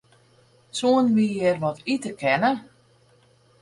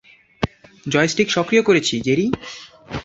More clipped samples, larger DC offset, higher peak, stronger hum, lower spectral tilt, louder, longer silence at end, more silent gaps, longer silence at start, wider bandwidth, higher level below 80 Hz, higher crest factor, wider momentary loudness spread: neither; neither; second, -8 dBFS vs -2 dBFS; neither; about the same, -5.5 dB/octave vs -4.5 dB/octave; second, -23 LUFS vs -19 LUFS; first, 1 s vs 0 s; neither; first, 0.75 s vs 0.4 s; first, 11.5 kHz vs 8 kHz; second, -66 dBFS vs -46 dBFS; about the same, 16 dB vs 18 dB; second, 8 LU vs 17 LU